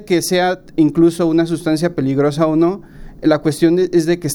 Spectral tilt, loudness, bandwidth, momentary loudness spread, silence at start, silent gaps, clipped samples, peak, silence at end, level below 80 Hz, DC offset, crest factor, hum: -6 dB/octave; -15 LUFS; 17 kHz; 5 LU; 0 s; none; under 0.1%; -2 dBFS; 0 s; -44 dBFS; under 0.1%; 14 dB; none